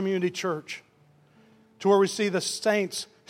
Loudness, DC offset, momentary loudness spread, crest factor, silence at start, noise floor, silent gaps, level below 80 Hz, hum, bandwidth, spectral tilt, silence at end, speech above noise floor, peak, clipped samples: -26 LUFS; under 0.1%; 12 LU; 18 dB; 0 s; -60 dBFS; none; -80 dBFS; none; 15.5 kHz; -4 dB/octave; 0.25 s; 34 dB; -10 dBFS; under 0.1%